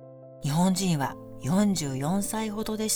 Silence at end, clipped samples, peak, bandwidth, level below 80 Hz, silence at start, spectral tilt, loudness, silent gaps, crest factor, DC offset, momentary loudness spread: 0 s; under 0.1%; -12 dBFS; over 20 kHz; -52 dBFS; 0 s; -5 dB/octave; -27 LUFS; none; 16 dB; under 0.1%; 10 LU